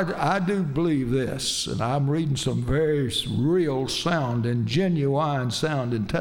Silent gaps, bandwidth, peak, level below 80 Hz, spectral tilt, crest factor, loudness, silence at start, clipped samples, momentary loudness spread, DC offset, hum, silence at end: none; 16.5 kHz; -10 dBFS; -46 dBFS; -5.5 dB/octave; 14 dB; -24 LUFS; 0 s; under 0.1%; 3 LU; under 0.1%; none; 0 s